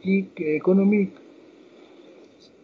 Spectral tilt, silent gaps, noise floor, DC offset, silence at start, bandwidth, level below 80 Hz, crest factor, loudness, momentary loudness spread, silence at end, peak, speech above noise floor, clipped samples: -10 dB/octave; none; -51 dBFS; under 0.1%; 0.05 s; 5 kHz; -74 dBFS; 16 dB; -22 LUFS; 8 LU; 1.55 s; -10 dBFS; 30 dB; under 0.1%